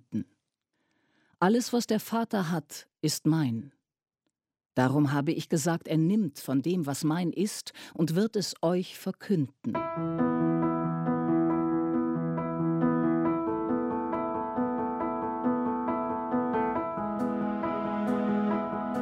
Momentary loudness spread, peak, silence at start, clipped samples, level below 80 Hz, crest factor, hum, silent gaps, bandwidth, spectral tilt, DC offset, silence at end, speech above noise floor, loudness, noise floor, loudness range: 6 LU; -10 dBFS; 0.1 s; under 0.1%; -64 dBFS; 18 dB; none; none; 16 kHz; -6 dB/octave; under 0.1%; 0 s; 56 dB; -29 LUFS; -84 dBFS; 2 LU